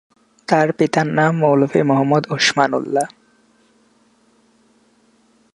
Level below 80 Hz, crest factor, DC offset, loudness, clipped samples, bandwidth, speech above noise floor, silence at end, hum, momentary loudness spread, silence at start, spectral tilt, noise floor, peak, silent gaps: -66 dBFS; 18 dB; under 0.1%; -17 LUFS; under 0.1%; 11.5 kHz; 41 dB; 2.45 s; 60 Hz at -55 dBFS; 7 LU; 0.5 s; -5 dB/octave; -57 dBFS; 0 dBFS; none